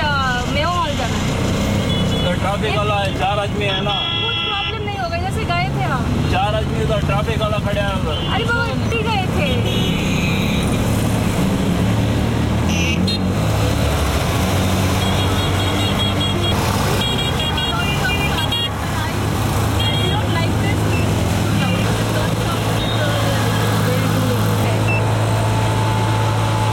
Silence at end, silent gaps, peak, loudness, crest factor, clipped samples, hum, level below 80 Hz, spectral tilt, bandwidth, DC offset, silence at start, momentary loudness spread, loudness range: 0 s; none; -6 dBFS; -18 LUFS; 12 dB; under 0.1%; none; -30 dBFS; -5 dB/octave; 17 kHz; under 0.1%; 0 s; 2 LU; 1 LU